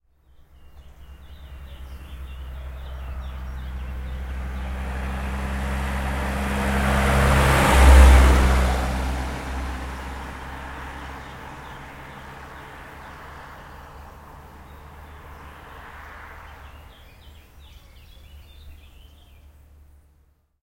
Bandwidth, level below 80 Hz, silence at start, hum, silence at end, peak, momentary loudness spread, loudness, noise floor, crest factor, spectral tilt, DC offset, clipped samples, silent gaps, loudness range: 15.5 kHz; -24 dBFS; 0.75 s; none; 1.9 s; 0 dBFS; 26 LU; -22 LUFS; -60 dBFS; 22 dB; -5.5 dB/octave; under 0.1%; under 0.1%; none; 25 LU